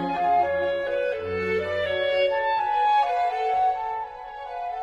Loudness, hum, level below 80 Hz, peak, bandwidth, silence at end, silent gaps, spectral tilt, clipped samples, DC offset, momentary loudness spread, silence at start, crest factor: -24 LUFS; none; -56 dBFS; -12 dBFS; 8.2 kHz; 0 s; none; -5.5 dB/octave; under 0.1%; under 0.1%; 11 LU; 0 s; 12 dB